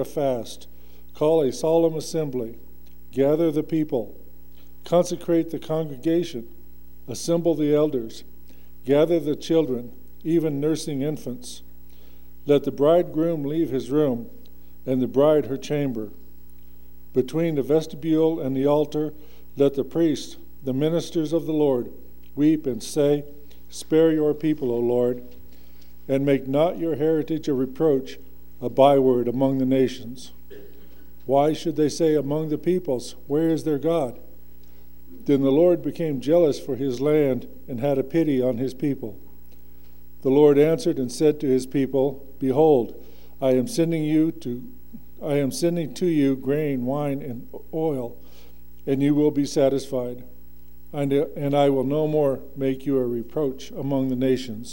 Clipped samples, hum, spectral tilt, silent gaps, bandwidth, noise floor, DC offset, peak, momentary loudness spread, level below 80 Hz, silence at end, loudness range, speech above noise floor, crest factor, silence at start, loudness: under 0.1%; none; -7 dB/octave; none; 16.5 kHz; -50 dBFS; 1%; -4 dBFS; 14 LU; -52 dBFS; 0 s; 4 LU; 28 dB; 20 dB; 0 s; -23 LUFS